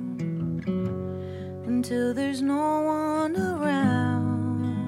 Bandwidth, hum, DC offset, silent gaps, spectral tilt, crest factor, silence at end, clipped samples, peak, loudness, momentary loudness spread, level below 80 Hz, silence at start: 14 kHz; none; under 0.1%; none; -7.5 dB/octave; 14 dB; 0 s; under 0.1%; -12 dBFS; -27 LUFS; 8 LU; -58 dBFS; 0 s